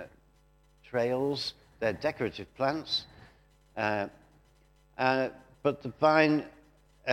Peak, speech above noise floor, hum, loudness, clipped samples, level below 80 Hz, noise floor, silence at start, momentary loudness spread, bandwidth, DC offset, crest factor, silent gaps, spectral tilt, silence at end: -8 dBFS; 34 dB; none; -30 LUFS; under 0.1%; -64 dBFS; -63 dBFS; 0 s; 14 LU; 15.5 kHz; under 0.1%; 24 dB; none; -5.5 dB/octave; 0 s